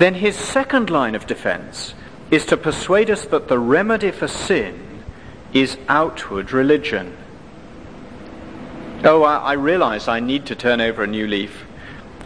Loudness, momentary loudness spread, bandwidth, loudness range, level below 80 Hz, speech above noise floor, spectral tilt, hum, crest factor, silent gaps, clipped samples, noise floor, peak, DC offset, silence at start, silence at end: -18 LUFS; 21 LU; 10.5 kHz; 3 LU; -46 dBFS; 21 dB; -4.5 dB/octave; none; 20 dB; none; under 0.1%; -39 dBFS; 0 dBFS; 0.5%; 0 s; 0 s